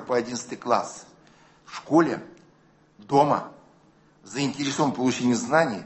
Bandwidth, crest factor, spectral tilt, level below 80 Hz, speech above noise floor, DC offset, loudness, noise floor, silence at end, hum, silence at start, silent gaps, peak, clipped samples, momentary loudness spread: 8.6 kHz; 20 dB; -5 dB/octave; -66 dBFS; 35 dB; under 0.1%; -24 LUFS; -59 dBFS; 0 s; none; 0 s; none; -6 dBFS; under 0.1%; 16 LU